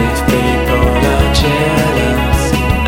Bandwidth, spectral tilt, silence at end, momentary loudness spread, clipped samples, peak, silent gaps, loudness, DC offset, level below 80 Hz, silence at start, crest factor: 17 kHz; -5.5 dB/octave; 0 s; 2 LU; under 0.1%; 0 dBFS; none; -12 LUFS; under 0.1%; -18 dBFS; 0 s; 12 dB